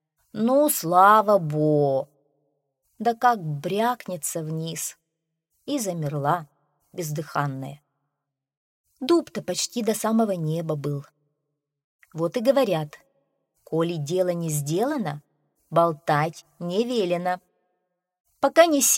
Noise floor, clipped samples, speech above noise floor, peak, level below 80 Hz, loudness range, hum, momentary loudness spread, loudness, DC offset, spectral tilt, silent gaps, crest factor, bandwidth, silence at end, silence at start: -83 dBFS; under 0.1%; 60 dB; -4 dBFS; -72 dBFS; 8 LU; none; 15 LU; -24 LUFS; under 0.1%; -4.5 dB/octave; 8.57-8.84 s, 11.84-11.99 s, 18.20-18.25 s; 22 dB; 16.5 kHz; 0 s; 0.35 s